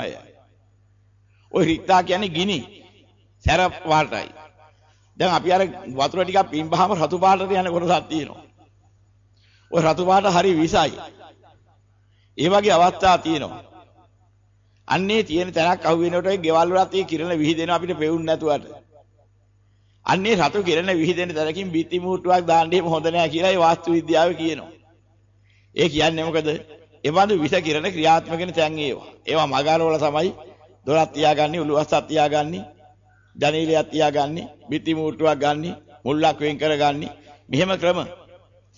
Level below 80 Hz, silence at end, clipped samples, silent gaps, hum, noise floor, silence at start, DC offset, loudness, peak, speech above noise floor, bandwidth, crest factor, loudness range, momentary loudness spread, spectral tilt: -50 dBFS; 0.65 s; under 0.1%; none; 50 Hz at -50 dBFS; -58 dBFS; 0 s; under 0.1%; -20 LUFS; -6 dBFS; 38 dB; 7.6 kHz; 14 dB; 3 LU; 10 LU; -5 dB/octave